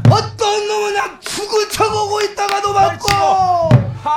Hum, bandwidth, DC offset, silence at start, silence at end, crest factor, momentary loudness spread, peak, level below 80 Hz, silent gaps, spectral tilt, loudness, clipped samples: none; 17.5 kHz; under 0.1%; 0 s; 0 s; 14 dB; 5 LU; 0 dBFS; -40 dBFS; none; -5 dB/octave; -15 LUFS; under 0.1%